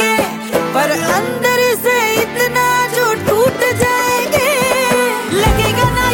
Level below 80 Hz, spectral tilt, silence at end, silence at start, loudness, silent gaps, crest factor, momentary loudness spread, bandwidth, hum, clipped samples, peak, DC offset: -30 dBFS; -3.5 dB/octave; 0 s; 0 s; -13 LUFS; none; 12 dB; 2 LU; 17 kHz; none; under 0.1%; 0 dBFS; under 0.1%